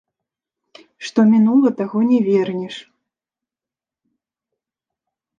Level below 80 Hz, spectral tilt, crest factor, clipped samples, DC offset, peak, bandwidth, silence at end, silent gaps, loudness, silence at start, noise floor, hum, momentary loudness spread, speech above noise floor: -72 dBFS; -7.5 dB/octave; 16 dB; under 0.1%; under 0.1%; -4 dBFS; 7.4 kHz; 2.55 s; none; -16 LUFS; 1 s; -89 dBFS; none; 18 LU; 74 dB